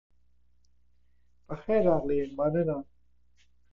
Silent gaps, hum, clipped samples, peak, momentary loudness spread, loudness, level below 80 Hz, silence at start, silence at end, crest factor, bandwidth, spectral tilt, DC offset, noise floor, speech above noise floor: none; none; under 0.1%; -12 dBFS; 14 LU; -28 LUFS; -58 dBFS; 0.1 s; 0 s; 20 dB; 6.8 kHz; -10 dB/octave; under 0.1%; -70 dBFS; 43 dB